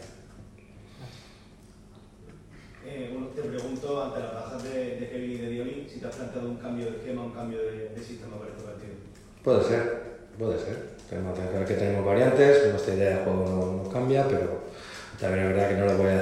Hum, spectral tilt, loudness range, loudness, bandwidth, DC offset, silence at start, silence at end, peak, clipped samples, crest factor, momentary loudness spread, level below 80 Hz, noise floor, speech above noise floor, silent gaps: none; -7 dB/octave; 13 LU; -28 LUFS; 12.5 kHz; under 0.1%; 0 s; 0 s; -6 dBFS; under 0.1%; 22 dB; 18 LU; -56 dBFS; -51 dBFS; 25 dB; none